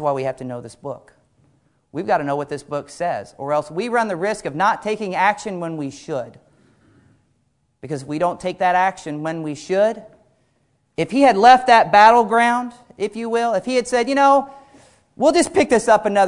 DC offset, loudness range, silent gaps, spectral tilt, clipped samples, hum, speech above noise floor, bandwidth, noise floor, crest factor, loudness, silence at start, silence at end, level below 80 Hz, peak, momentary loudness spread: under 0.1%; 11 LU; none; -4.5 dB/octave; under 0.1%; none; 48 dB; 11 kHz; -66 dBFS; 18 dB; -18 LUFS; 0 s; 0 s; -58 dBFS; 0 dBFS; 19 LU